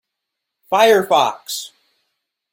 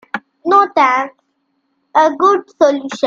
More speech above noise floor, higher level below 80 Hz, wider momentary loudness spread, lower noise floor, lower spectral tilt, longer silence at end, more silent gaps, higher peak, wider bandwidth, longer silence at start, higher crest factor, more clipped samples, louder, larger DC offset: first, 65 dB vs 53 dB; about the same, -68 dBFS vs -64 dBFS; first, 14 LU vs 11 LU; first, -80 dBFS vs -66 dBFS; about the same, -2.5 dB/octave vs -3.5 dB/octave; first, 0.85 s vs 0 s; neither; about the same, -2 dBFS vs 0 dBFS; first, 17 kHz vs 7.6 kHz; first, 0.7 s vs 0.15 s; about the same, 18 dB vs 14 dB; neither; second, -16 LUFS vs -13 LUFS; neither